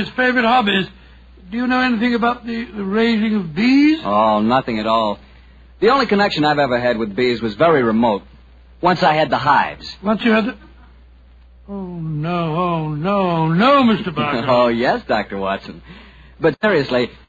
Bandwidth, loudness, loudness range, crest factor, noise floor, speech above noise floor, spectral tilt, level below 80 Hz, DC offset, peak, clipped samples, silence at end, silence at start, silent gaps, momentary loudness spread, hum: 7.8 kHz; -17 LUFS; 4 LU; 16 dB; -45 dBFS; 28 dB; -7 dB/octave; -46 dBFS; under 0.1%; -2 dBFS; under 0.1%; 0.15 s; 0 s; none; 11 LU; none